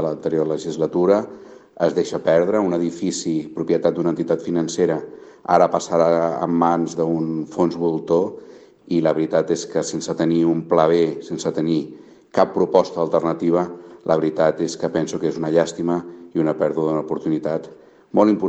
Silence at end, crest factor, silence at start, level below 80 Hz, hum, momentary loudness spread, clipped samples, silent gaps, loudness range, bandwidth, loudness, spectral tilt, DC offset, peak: 0 s; 18 dB; 0 s; -62 dBFS; none; 8 LU; under 0.1%; none; 2 LU; 8.6 kHz; -20 LUFS; -6 dB/octave; under 0.1%; 0 dBFS